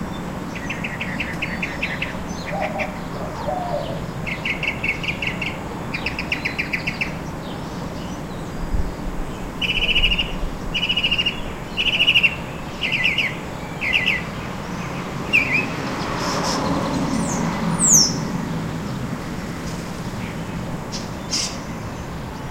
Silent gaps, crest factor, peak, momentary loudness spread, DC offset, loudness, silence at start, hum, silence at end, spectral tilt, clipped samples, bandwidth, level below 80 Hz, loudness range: none; 22 dB; -2 dBFS; 13 LU; under 0.1%; -22 LUFS; 0 s; none; 0 s; -2.5 dB/octave; under 0.1%; 16 kHz; -34 dBFS; 8 LU